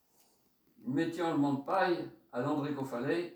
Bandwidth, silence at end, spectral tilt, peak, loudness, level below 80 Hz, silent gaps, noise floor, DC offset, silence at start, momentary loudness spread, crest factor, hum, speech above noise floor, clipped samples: over 20 kHz; 0 s; -7 dB/octave; -18 dBFS; -34 LUFS; -78 dBFS; none; -71 dBFS; under 0.1%; 0.8 s; 7 LU; 16 dB; none; 38 dB; under 0.1%